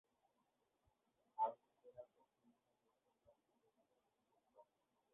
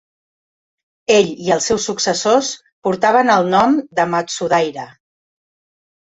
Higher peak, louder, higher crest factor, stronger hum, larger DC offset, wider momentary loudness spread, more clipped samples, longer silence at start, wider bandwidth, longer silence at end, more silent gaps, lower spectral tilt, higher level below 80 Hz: second, -30 dBFS vs -2 dBFS; second, -45 LUFS vs -16 LUFS; first, 26 dB vs 16 dB; neither; neither; first, 20 LU vs 11 LU; neither; first, 1.4 s vs 1.1 s; second, 3.7 kHz vs 8.4 kHz; second, 0.5 s vs 1.15 s; second, none vs 2.72-2.82 s; second, -0.5 dB/octave vs -3.5 dB/octave; second, under -90 dBFS vs -56 dBFS